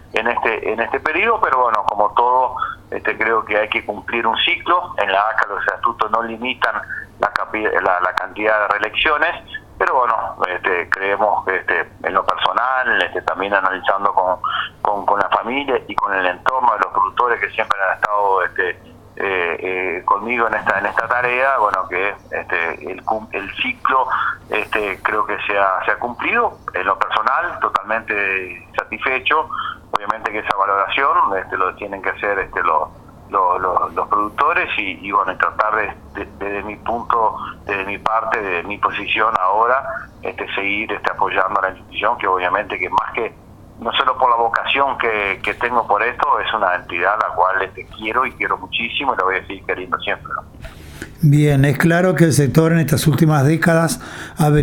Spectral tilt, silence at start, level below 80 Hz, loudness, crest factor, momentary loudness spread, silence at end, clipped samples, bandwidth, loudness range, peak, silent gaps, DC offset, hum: -5.5 dB/octave; 0.15 s; -46 dBFS; -18 LUFS; 18 dB; 8 LU; 0 s; under 0.1%; 18 kHz; 3 LU; 0 dBFS; none; under 0.1%; none